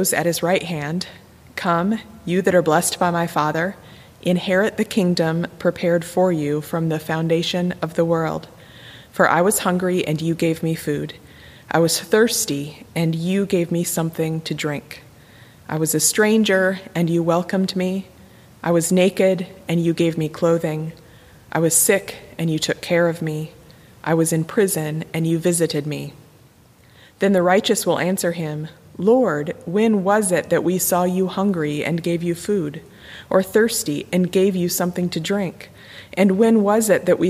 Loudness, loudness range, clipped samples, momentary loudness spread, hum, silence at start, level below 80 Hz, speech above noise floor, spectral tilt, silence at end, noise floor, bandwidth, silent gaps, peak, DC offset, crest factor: -20 LUFS; 2 LU; under 0.1%; 12 LU; none; 0 s; -56 dBFS; 31 dB; -4.5 dB/octave; 0 s; -51 dBFS; 15.5 kHz; none; -2 dBFS; under 0.1%; 18 dB